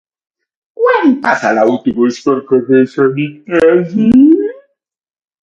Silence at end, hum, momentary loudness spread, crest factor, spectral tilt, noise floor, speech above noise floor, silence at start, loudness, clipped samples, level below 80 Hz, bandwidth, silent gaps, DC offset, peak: 0.9 s; none; 8 LU; 12 dB; -7 dB/octave; -72 dBFS; 61 dB; 0.8 s; -11 LUFS; under 0.1%; -48 dBFS; 7.6 kHz; none; under 0.1%; 0 dBFS